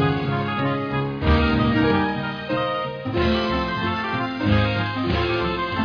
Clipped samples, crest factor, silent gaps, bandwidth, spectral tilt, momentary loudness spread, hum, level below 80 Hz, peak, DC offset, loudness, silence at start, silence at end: under 0.1%; 14 dB; none; 5.4 kHz; -8 dB/octave; 6 LU; none; -32 dBFS; -6 dBFS; under 0.1%; -22 LUFS; 0 s; 0 s